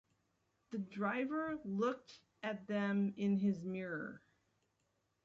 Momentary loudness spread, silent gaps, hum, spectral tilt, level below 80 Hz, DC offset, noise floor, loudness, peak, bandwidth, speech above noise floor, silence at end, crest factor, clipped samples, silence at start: 11 LU; none; none; -6 dB/octave; -80 dBFS; under 0.1%; -82 dBFS; -39 LUFS; -24 dBFS; 7.2 kHz; 43 dB; 1.05 s; 16 dB; under 0.1%; 0.7 s